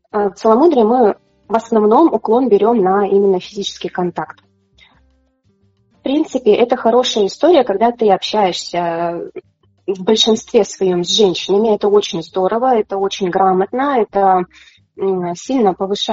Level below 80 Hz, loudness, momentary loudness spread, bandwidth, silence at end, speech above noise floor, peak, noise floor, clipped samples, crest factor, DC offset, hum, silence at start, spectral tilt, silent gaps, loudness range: -56 dBFS; -14 LUFS; 10 LU; 8 kHz; 0 s; 44 dB; 0 dBFS; -58 dBFS; under 0.1%; 14 dB; under 0.1%; none; 0.15 s; -3.5 dB/octave; none; 5 LU